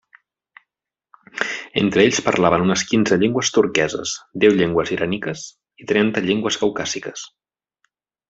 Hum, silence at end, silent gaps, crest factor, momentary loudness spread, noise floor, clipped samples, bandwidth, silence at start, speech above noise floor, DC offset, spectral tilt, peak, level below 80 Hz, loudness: none; 1.05 s; none; 18 dB; 15 LU; -82 dBFS; under 0.1%; 8 kHz; 1.35 s; 64 dB; under 0.1%; -4 dB/octave; -2 dBFS; -56 dBFS; -19 LUFS